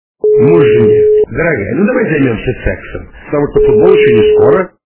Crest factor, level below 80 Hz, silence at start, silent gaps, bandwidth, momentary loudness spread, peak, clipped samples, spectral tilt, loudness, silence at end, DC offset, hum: 10 dB; -30 dBFS; 0.25 s; none; 3.4 kHz; 11 LU; 0 dBFS; 0.6%; -11.5 dB/octave; -9 LUFS; 0.2 s; under 0.1%; none